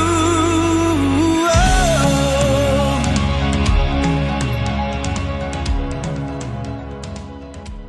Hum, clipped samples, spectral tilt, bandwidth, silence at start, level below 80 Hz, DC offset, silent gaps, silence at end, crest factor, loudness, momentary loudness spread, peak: none; under 0.1%; -5.5 dB/octave; 12 kHz; 0 s; -24 dBFS; under 0.1%; none; 0 s; 14 dB; -17 LUFS; 14 LU; -2 dBFS